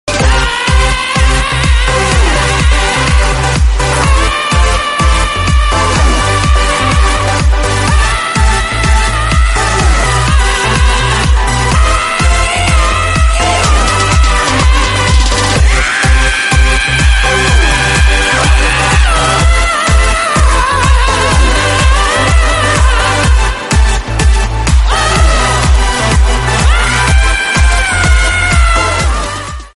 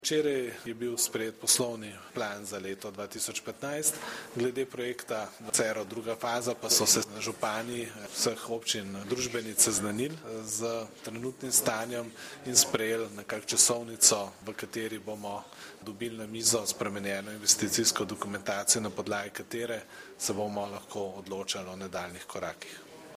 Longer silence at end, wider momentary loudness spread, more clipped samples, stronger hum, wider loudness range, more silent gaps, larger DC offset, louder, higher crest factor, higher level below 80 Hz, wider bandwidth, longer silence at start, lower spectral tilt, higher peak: about the same, 0.05 s vs 0 s; second, 2 LU vs 15 LU; neither; neither; second, 2 LU vs 7 LU; neither; neither; first, -10 LUFS vs -30 LUFS; second, 8 dB vs 28 dB; first, -12 dBFS vs -70 dBFS; second, 11.5 kHz vs 15.5 kHz; about the same, 0.05 s vs 0 s; first, -3.5 dB/octave vs -1.5 dB/octave; first, 0 dBFS vs -4 dBFS